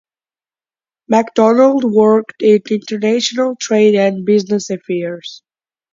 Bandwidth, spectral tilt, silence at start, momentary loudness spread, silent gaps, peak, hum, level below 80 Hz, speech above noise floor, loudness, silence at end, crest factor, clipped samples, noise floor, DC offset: 7.6 kHz; -5 dB/octave; 1.1 s; 10 LU; none; 0 dBFS; none; -62 dBFS; over 77 dB; -14 LUFS; 0.6 s; 14 dB; under 0.1%; under -90 dBFS; under 0.1%